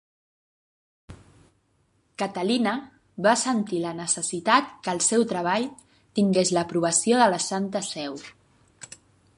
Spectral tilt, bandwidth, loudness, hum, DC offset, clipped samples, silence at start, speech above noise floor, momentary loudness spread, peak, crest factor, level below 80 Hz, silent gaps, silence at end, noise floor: -3.5 dB/octave; 11.5 kHz; -24 LUFS; none; under 0.1%; under 0.1%; 1.1 s; 43 dB; 14 LU; -4 dBFS; 22 dB; -66 dBFS; none; 1.05 s; -67 dBFS